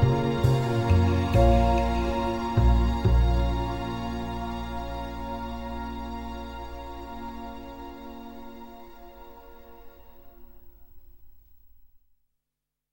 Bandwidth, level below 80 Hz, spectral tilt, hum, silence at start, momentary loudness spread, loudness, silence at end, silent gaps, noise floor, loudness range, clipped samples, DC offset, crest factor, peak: 16 kHz; -32 dBFS; -7.5 dB/octave; none; 0 s; 21 LU; -26 LUFS; 1 s; none; -86 dBFS; 22 LU; under 0.1%; 0.3%; 18 dB; -8 dBFS